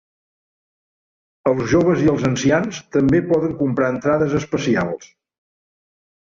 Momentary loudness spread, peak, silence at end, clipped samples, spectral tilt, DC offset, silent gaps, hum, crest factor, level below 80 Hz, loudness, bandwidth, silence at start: 5 LU; -4 dBFS; 1.15 s; under 0.1%; -6.5 dB/octave; under 0.1%; none; none; 16 dB; -48 dBFS; -18 LUFS; 7.6 kHz; 1.45 s